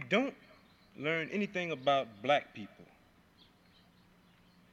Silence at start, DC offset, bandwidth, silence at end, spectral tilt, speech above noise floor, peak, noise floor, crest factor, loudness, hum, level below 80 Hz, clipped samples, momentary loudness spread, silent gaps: 0 s; under 0.1%; 8.6 kHz; 1.9 s; -5.5 dB/octave; 31 dB; -16 dBFS; -64 dBFS; 22 dB; -33 LUFS; none; -76 dBFS; under 0.1%; 15 LU; none